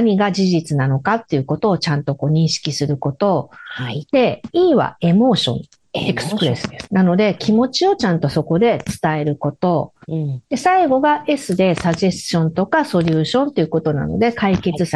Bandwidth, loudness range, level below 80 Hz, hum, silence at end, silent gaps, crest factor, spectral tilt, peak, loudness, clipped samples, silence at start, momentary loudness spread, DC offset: 12.5 kHz; 2 LU; -48 dBFS; none; 0 s; none; 14 dB; -6 dB/octave; -2 dBFS; -17 LUFS; under 0.1%; 0 s; 7 LU; under 0.1%